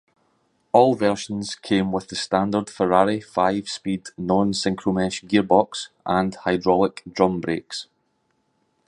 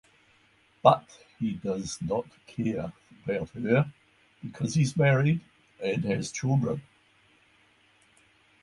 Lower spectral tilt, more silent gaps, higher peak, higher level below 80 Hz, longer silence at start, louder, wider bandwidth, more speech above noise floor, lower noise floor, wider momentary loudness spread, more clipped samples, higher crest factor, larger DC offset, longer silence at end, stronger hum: about the same, -5.5 dB/octave vs -6.5 dB/octave; neither; about the same, -2 dBFS vs -4 dBFS; first, -54 dBFS vs -60 dBFS; about the same, 0.75 s vs 0.85 s; first, -22 LUFS vs -28 LUFS; about the same, 11 kHz vs 11.5 kHz; first, 48 dB vs 37 dB; first, -69 dBFS vs -64 dBFS; second, 10 LU vs 13 LU; neither; second, 20 dB vs 26 dB; neither; second, 1.05 s vs 1.8 s; neither